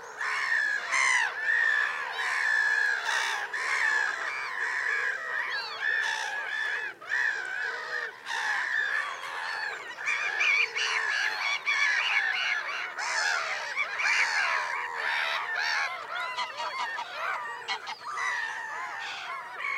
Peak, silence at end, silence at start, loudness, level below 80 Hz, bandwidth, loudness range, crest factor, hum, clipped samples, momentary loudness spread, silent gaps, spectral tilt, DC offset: -14 dBFS; 0 s; 0 s; -28 LUFS; -86 dBFS; 16 kHz; 5 LU; 16 dB; none; under 0.1%; 10 LU; none; 2 dB/octave; under 0.1%